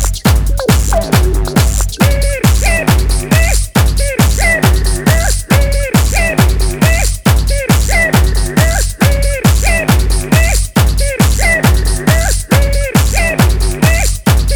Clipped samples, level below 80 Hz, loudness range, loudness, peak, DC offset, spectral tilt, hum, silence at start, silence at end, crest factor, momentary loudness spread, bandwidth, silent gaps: under 0.1%; -14 dBFS; 0 LU; -12 LUFS; 0 dBFS; under 0.1%; -4.5 dB/octave; none; 0 s; 0 s; 10 dB; 3 LU; over 20 kHz; none